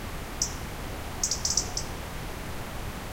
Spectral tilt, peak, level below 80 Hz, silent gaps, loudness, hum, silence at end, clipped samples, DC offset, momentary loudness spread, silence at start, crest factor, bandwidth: -2 dB/octave; -10 dBFS; -40 dBFS; none; -31 LUFS; none; 0 s; under 0.1%; 0.1%; 11 LU; 0 s; 24 dB; 17 kHz